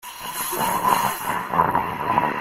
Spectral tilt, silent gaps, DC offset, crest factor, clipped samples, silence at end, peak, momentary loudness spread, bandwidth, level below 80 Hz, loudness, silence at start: -3.5 dB/octave; none; under 0.1%; 20 dB; under 0.1%; 0 s; -2 dBFS; 6 LU; 16.5 kHz; -52 dBFS; -22 LUFS; 0.05 s